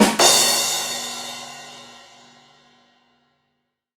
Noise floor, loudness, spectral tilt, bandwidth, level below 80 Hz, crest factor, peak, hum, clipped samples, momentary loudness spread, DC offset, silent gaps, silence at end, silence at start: -74 dBFS; -17 LUFS; -1 dB/octave; over 20 kHz; -62 dBFS; 22 dB; 0 dBFS; none; under 0.1%; 25 LU; under 0.1%; none; 2.05 s; 0 s